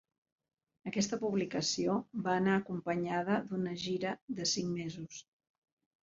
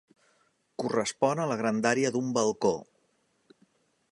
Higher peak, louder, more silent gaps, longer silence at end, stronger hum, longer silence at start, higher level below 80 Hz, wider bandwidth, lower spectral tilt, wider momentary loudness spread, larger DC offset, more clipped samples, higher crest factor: second, -18 dBFS vs -8 dBFS; second, -35 LUFS vs -28 LUFS; first, 4.22-4.28 s vs none; second, 0.85 s vs 1.3 s; neither; about the same, 0.85 s vs 0.8 s; about the same, -72 dBFS vs -72 dBFS; second, 7.6 kHz vs 11.5 kHz; about the same, -4.5 dB/octave vs -4.5 dB/octave; about the same, 9 LU vs 8 LU; neither; neither; about the same, 18 dB vs 22 dB